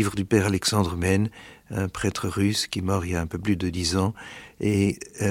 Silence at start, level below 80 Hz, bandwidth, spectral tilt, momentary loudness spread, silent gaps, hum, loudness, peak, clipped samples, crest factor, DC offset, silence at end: 0 s; -46 dBFS; 16.5 kHz; -5 dB/octave; 8 LU; none; none; -25 LUFS; -6 dBFS; under 0.1%; 20 dB; under 0.1%; 0 s